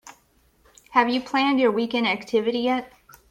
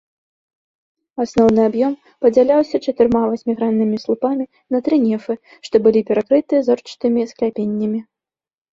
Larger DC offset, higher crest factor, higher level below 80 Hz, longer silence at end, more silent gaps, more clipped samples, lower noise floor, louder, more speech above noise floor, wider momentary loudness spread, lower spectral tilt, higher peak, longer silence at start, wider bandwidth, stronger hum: neither; about the same, 18 dB vs 16 dB; second, -64 dBFS vs -54 dBFS; second, 0.45 s vs 0.7 s; neither; neither; second, -61 dBFS vs under -90 dBFS; second, -22 LUFS vs -17 LUFS; second, 40 dB vs over 73 dB; second, 4 LU vs 9 LU; second, -4.5 dB/octave vs -7.5 dB/octave; second, -6 dBFS vs -2 dBFS; second, 0.05 s vs 1.15 s; first, 15 kHz vs 7.6 kHz; neither